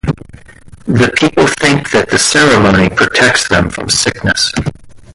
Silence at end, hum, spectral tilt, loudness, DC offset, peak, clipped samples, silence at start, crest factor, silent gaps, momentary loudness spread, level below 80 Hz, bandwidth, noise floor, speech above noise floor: 0.15 s; none; -3.5 dB/octave; -10 LUFS; under 0.1%; 0 dBFS; under 0.1%; 0.05 s; 12 dB; none; 11 LU; -32 dBFS; 11.5 kHz; -35 dBFS; 25 dB